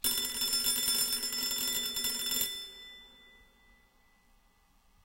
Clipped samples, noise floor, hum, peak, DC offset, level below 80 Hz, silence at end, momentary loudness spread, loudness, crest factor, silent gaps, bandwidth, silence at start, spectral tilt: under 0.1%; -66 dBFS; none; -16 dBFS; under 0.1%; -62 dBFS; 1.75 s; 18 LU; -30 LUFS; 18 dB; none; 17 kHz; 0.05 s; 1 dB/octave